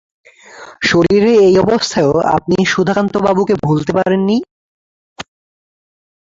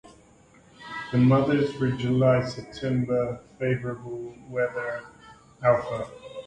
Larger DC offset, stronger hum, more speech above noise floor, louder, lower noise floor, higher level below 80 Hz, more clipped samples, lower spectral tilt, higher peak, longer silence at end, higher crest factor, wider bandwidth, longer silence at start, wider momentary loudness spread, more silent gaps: neither; neither; second, 25 dB vs 31 dB; first, -13 LUFS vs -26 LUFS; second, -37 dBFS vs -55 dBFS; first, -46 dBFS vs -56 dBFS; neither; second, -5.5 dB/octave vs -8 dB/octave; first, -2 dBFS vs -8 dBFS; first, 1 s vs 0 s; second, 12 dB vs 18 dB; second, 7.8 kHz vs 9.2 kHz; first, 0.55 s vs 0.05 s; second, 9 LU vs 16 LU; first, 4.51-5.16 s vs none